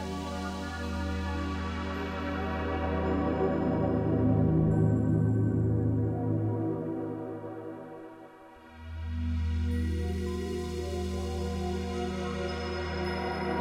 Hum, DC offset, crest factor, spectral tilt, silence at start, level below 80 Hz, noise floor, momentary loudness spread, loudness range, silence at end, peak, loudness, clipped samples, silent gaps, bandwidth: none; under 0.1%; 16 dB; -7.5 dB/octave; 0 s; -40 dBFS; -51 dBFS; 14 LU; 8 LU; 0 s; -14 dBFS; -31 LUFS; under 0.1%; none; 11.5 kHz